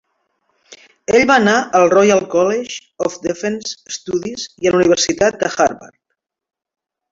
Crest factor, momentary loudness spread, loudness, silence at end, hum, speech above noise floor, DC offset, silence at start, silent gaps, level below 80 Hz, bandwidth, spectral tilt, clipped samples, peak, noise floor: 16 dB; 14 LU; -15 LUFS; 1.25 s; none; 60 dB; under 0.1%; 0.7 s; none; -52 dBFS; 7.8 kHz; -3.5 dB/octave; under 0.1%; 0 dBFS; -75 dBFS